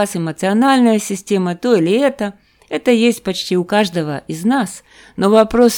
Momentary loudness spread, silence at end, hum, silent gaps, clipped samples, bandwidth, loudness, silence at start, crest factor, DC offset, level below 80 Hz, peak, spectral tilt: 13 LU; 0 s; none; none; under 0.1%; 18 kHz; -16 LUFS; 0 s; 16 dB; under 0.1%; -48 dBFS; 0 dBFS; -5 dB/octave